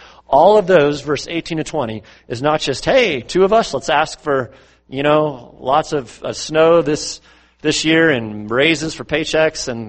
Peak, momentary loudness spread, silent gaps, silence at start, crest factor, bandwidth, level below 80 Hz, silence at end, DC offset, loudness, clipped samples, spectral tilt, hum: 0 dBFS; 12 LU; none; 0.3 s; 16 dB; 8.8 kHz; -44 dBFS; 0 s; under 0.1%; -16 LUFS; under 0.1%; -4.5 dB/octave; none